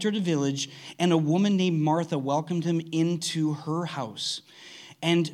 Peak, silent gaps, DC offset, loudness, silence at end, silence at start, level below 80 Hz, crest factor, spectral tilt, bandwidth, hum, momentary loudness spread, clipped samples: -8 dBFS; none; under 0.1%; -27 LUFS; 0 s; 0 s; -78 dBFS; 18 dB; -5.5 dB/octave; 13 kHz; none; 10 LU; under 0.1%